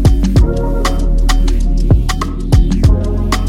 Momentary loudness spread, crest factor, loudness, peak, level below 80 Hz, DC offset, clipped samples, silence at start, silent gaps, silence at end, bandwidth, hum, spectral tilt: 5 LU; 10 dB; -14 LUFS; 0 dBFS; -12 dBFS; under 0.1%; under 0.1%; 0 s; none; 0 s; 13 kHz; none; -6.5 dB/octave